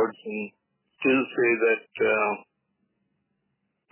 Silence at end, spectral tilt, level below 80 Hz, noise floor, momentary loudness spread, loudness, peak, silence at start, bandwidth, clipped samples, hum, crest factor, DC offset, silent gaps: 1.5 s; -9 dB/octave; -74 dBFS; -77 dBFS; 13 LU; -25 LUFS; -10 dBFS; 0 s; 3.2 kHz; under 0.1%; none; 16 dB; under 0.1%; none